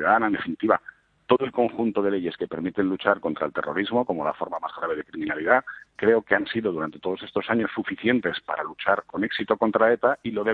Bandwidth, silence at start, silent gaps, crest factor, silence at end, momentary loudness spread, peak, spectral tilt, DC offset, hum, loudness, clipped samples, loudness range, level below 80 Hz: 4.7 kHz; 0 s; none; 22 dB; 0 s; 9 LU; -2 dBFS; -8 dB/octave; under 0.1%; none; -25 LUFS; under 0.1%; 2 LU; -62 dBFS